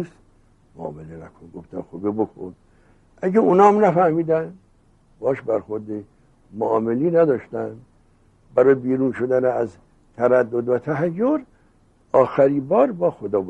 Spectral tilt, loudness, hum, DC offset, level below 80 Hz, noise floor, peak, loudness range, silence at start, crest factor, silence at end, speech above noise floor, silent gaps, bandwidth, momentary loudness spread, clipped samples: -9 dB/octave; -20 LUFS; none; under 0.1%; -58 dBFS; -57 dBFS; 0 dBFS; 4 LU; 0 s; 20 dB; 0 s; 37 dB; none; 8.2 kHz; 18 LU; under 0.1%